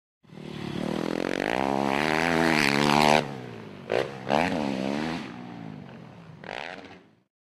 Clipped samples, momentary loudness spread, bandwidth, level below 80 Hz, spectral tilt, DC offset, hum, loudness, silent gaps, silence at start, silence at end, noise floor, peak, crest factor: under 0.1%; 21 LU; 16 kHz; -56 dBFS; -4.5 dB/octave; under 0.1%; none; -26 LUFS; none; 0.3 s; 0.45 s; -49 dBFS; -6 dBFS; 22 dB